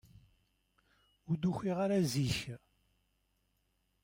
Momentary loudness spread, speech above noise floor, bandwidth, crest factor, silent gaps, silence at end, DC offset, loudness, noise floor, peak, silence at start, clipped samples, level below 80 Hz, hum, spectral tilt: 12 LU; 44 dB; 16 kHz; 16 dB; none; 1.45 s; under 0.1%; -34 LUFS; -78 dBFS; -22 dBFS; 1.3 s; under 0.1%; -64 dBFS; 50 Hz at -60 dBFS; -6 dB/octave